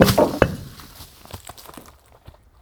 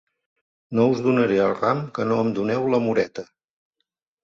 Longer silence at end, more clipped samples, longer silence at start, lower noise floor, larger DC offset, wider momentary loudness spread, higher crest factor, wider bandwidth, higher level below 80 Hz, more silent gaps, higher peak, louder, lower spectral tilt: second, 0.8 s vs 1 s; neither; second, 0 s vs 0.7 s; second, -48 dBFS vs -79 dBFS; neither; first, 24 LU vs 7 LU; about the same, 22 dB vs 18 dB; first, over 20 kHz vs 7.4 kHz; first, -38 dBFS vs -62 dBFS; neither; first, 0 dBFS vs -6 dBFS; first, -19 LUFS vs -22 LUFS; second, -5.5 dB/octave vs -7.5 dB/octave